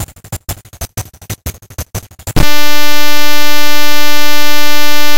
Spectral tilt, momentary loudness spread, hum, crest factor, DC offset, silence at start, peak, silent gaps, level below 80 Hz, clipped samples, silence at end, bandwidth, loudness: -2.5 dB/octave; 12 LU; none; 6 dB; 60%; 0 s; 0 dBFS; none; -28 dBFS; 30%; 0 s; over 20 kHz; -15 LUFS